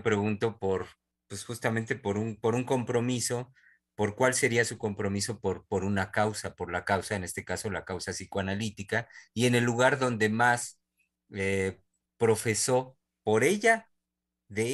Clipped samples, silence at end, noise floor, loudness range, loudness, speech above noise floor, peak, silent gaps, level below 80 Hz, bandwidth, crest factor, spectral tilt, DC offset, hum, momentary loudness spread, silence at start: under 0.1%; 0 s; -86 dBFS; 4 LU; -29 LUFS; 57 dB; -8 dBFS; none; -64 dBFS; 13 kHz; 22 dB; -4.5 dB/octave; under 0.1%; none; 10 LU; 0 s